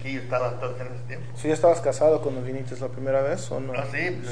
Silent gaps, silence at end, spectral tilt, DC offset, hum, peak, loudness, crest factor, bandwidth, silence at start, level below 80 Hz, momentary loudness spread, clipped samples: none; 0 s; -6 dB/octave; 2%; none; -8 dBFS; -26 LUFS; 16 dB; 10 kHz; 0 s; -56 dBFS; 13 LU; under 0.1%